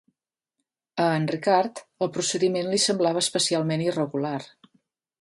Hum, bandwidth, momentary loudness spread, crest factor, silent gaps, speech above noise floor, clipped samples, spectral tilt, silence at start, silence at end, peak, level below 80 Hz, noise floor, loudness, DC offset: none; 11.5 kHz; 8 LU; 18 dB; none; 58 dB; under 0.1%; -4 dB/octave; 0.95 s; 0.75 s; -8 dBFS; -72 dBFS; -82 dBFS; -24 LUFS; under 0.1%